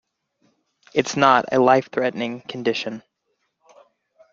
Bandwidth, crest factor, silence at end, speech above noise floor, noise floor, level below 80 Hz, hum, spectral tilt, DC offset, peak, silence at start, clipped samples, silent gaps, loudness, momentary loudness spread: 7.6 kHz; 22 dB; 1.35 s; 54 dB; -73 dBFS; -66 dBFS; none; -4.5 dB/octave; under 0.1%; -2 dBFS; 0.95 s; under 0.1%; none; -20 LUFS; 12 LU